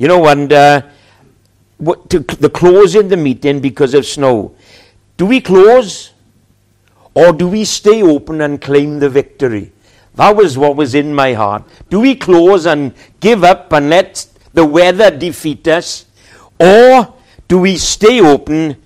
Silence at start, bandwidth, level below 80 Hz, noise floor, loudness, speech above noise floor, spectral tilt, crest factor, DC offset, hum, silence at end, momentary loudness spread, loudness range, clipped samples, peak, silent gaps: 0 s; 14.5 kHz; -40 dBFS; -52 dBFS; -9 LUFS; 43 dB; -5 dB/octave; 10 dB; under 0.1%; none; 0.1 s; 11 LU; 3 LU; 2%; 0 dBFS; none